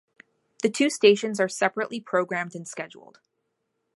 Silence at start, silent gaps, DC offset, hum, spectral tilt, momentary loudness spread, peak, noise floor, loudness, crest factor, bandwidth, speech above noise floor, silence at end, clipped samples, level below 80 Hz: 0.65 s; none; under 0.1%; none; -3.5 dB/octave; 16 LU; -4 dBFS; -78 dBFS; -24 LUFS; 22 dB; 11.5 kHz; 53 dB; 1.1 s; under 0.1%; -78 dBFS